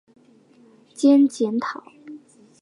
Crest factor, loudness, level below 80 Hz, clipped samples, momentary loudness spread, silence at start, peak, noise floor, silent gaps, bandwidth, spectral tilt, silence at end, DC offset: 16 dB; -20 LUFS; -82 dBFS; under 0.1%; 26 LU; 1 s; -6 dBFS; -54 dBFS; none; 11 kHz; -5 dB/octave; 0.45 s; under 0.1%